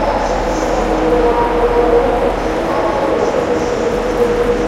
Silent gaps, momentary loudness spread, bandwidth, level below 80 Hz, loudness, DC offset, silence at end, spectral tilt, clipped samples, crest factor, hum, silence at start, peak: none; 4 LU; 13.5 kHz; -26 dBFS; -15 LUFS; under 0.1%; 0 s; -5.5 dB/octave; under 0.1%; 14 dB; none; 0 s; 0 dBFS